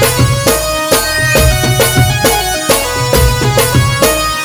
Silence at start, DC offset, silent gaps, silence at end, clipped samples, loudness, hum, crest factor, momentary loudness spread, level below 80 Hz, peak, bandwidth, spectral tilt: 0 s; under 0.1%; none; 0 s; 0.2%; -10 LUFS; none; 10 dB; 2 LU; -20 dBFS; 0 dBFS; over 20 kHz; -3.5 dB/octave